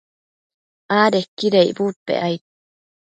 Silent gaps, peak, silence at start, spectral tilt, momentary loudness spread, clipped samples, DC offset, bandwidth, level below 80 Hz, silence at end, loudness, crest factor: 1.28-1.37 s, 1.96-2.06 s; -2 dBFS; 0.9 s; -5.5 dB/octave; 8 LU; under 0.1%; under 0.1%; 9.2 kHz; -68 dBFS; 0.65 s; -19 LUFS; 20 dB